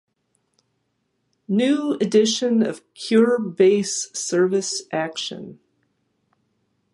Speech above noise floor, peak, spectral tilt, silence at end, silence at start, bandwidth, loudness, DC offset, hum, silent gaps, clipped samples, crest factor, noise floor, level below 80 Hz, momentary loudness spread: 52 dB; -4 dBFS; -4 dB/octave; 1.4 s; 1.5 s; 11.5 kHz; -20 LUFS; under 0.1%; none; none; under 0.1%; 18 dB; -72 dBFS; -74 dBFS; 11 LU